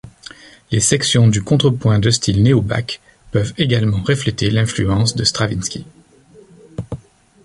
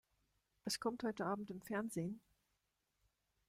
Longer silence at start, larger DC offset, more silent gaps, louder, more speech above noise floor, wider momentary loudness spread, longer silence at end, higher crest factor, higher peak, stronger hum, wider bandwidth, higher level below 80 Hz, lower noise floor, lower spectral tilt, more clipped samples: second, 0.05 s vs 0.65 s; neither; neither; first, -16 LUFS vs -43 LUFS; second, 31 dB vs 43 dB; first, 18 LU vs 7 LU; second, 0.5 s vs 1.3 s; about the same, 18 dB vs 20 dB; first, 0 dBFS vs -26 dBFS; second, none vs 50 Hz at -75 dBFS; second, 11.5 kHz vs 16 kHz; first, -38 dBFS vs -78 dBFS; second, -46 dBFS vs -86 dBFS; about the same, -5 dB/octave vs -4.5 dB/octave; neither